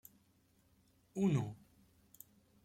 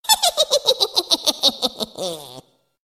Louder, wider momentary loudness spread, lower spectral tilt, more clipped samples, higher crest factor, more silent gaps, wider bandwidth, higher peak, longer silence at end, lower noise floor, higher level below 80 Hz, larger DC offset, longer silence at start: second, -38 LUFS vs -18 LUFS; first, 24 LU vs 13 LU; first, -8 dB/octave vs 0 dB/octave; neither; about the same, 18 dB vs 20 dB; neither; about the same, 16.5 kHz vs 16.5 kHz; second, -24 dBFS vs 0 dBFS; first, 1.1 s vs 0.45 s; first, -73 dBFS vs -45 dBFS; second, -74 dBFS vs -60 dBFS; neither; first, 1.15 s vs 0.05 s